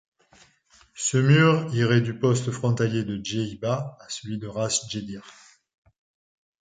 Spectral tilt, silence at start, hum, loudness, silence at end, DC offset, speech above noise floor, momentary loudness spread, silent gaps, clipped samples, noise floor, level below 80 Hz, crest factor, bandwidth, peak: -5 dB/octave; 0.95 s; none; -24 LUFS; 1.3 s; under 0.1%; 35 dB; 15 LU; none; under 0.1%; -59 dBFS; -60 dBFS; 20 dB; 9.6 kHz; -6 dBFS